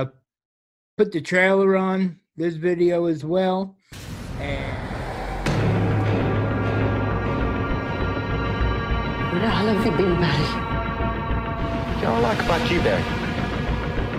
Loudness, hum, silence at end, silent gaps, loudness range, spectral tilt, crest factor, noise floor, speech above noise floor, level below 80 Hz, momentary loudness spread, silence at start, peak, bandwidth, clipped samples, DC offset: -23 LUFS; none; 0 s; 0.45-0.97 s; 3 LU; -7 dB/octave; 16 dB; under -90 dBFS; over 69 dB; -32 dBFS; 9 LU; 0 s; -6 dBFS; 15 kHz; under 0.1%; under 0.1%